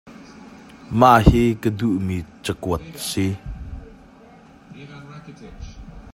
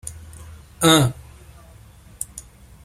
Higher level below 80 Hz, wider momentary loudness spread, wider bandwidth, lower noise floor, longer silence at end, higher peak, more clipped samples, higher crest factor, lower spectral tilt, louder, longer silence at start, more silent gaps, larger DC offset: first, -32 dBFS vs -46 dBFS; about the same, 27 LU vs 26 LU; about the same, 16.5 kHz vs 16.5 kHz; about the same, -47 dBFS vs -46 dBFS; second, 0.05 s vs 0.45 s; about the same, 0 dBFS vs 0 dBFS; neither; about the same, 22 dB vs 24 dB; first, -6.5 dB/octave vs -4 dB/octave; about the same, -19 LUFS vs -19 LUFS; about the same, 0.05 s vs 0.05 s; neither; neither